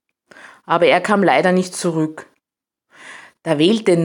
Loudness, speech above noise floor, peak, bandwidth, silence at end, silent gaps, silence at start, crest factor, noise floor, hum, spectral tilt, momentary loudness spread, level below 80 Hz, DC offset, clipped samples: -16 LUFS; 70 dB; 0 dBFS; 17 kHz; 0 s; none; 0.7 s; 18 dB; -86 dBFS; none; -5.5 dB/octave; 20 LU; -68 dBFS; under 0.1%; under 0.1%